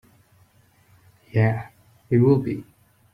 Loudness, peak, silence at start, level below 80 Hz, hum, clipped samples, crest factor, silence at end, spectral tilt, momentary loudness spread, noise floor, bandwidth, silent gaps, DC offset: -22 LUFS; -6 dBFS; 1.35 s; -58 dBFS; none; under 0.1%; 18 dB; 0.5 s; -10 dB/octave; 15 LU; -58 dBFS; 5.4 kHz; none; under 0.1%